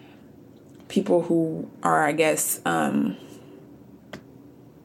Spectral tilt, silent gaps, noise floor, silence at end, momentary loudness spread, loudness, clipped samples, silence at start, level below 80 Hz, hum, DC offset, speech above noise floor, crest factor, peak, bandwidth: -4.5 dB/octave; none; -49 dBFS; 0.4 s; 22 LU; -23 LUFS; under 0.1%; 0.9 s; -66 dBFS; none; under 0.1%; 26 dB; 20 dB; -6 dBFS; 17 kHz